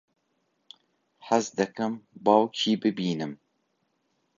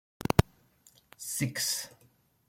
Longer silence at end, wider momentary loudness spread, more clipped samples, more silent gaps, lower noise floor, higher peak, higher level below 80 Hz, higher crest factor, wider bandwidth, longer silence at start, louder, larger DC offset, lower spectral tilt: first, 1.05 s vs 0.6 s; second, 10 LU vs 16 LU; neither; neither; first, -74 dBFS vs -66 dBFS; about the same, -6 dBFS vs -4 dBFS; second, -74 dBFS vs -48 dBFS; second, 22 dB vs 30 dB; second, 7.6 kHz vs 16.5 kHz; first, 1.25 s vs 0.3 s; first, -26 LUFS vs -30 LUFS; neither; about the same, -5 dB/octave vs -4 dB/octave